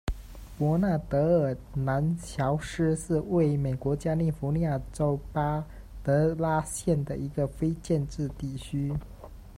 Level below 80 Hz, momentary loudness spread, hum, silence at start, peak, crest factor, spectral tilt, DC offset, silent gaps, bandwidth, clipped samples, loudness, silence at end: -44 dBFS; 9 LU; none; 0.05 s; -12 dBFS; 16 dB; -7.5 dB/octave; under 0.1%; none; 14.5 kHz; under 0.1%; -29 LUFS; 0.05 s